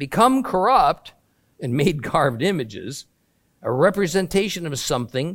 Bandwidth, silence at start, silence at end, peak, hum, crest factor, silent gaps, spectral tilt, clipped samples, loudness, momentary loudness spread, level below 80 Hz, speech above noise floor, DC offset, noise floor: 17 kHz; 0 s; 0 s; -2 dBFS; none; 20 dB; none; -5 dB/octave; under 0.1%; -20 LUFS; 14 LU; -48 dBFS; 45 dB; under 0.1%; -65 dBFS